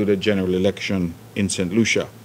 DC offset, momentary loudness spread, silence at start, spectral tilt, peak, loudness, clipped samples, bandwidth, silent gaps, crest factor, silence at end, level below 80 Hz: under 0.1%; 6 LU; 0 s; -5 dB/octave; -6 dBFS; -21 LUFS; under 0.1%; 16 kHz; none; 16 dB; 0 s; -52 dBFS